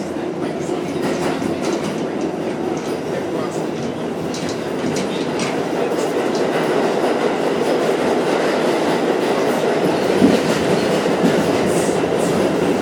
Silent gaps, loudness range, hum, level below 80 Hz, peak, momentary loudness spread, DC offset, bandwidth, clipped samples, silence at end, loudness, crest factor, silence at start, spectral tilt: none; 6 LU; none; -54 dBFS; 0 dBFS; 7 LU; under 0.1%; 19 kHz; under 0.1%; 0 s; -19 LUFS; 18 dB; 0 s; -5 dB/octave